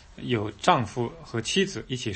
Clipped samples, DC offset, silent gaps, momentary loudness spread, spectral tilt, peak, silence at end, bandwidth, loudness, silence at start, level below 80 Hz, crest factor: under 0.1%; under 0.1%; none; 9 LU; -4.5 dB/octave; -4 dBFS; 0 s; 8.8 kHz; -27 LUFS; 0.1 s; -54 dBFS; 22 dB